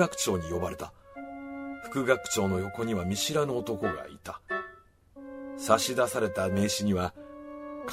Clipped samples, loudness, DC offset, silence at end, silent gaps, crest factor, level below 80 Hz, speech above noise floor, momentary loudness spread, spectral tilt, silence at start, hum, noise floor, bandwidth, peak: under 0.1%; -30 LUFS; under 0.1%; 0 s; none; 24 dB; -58 dBFS; 25 dB; 17 LU; -4 dB/octave; 0 s; none; -54 dBFS; 16 kHz; -8 dBFS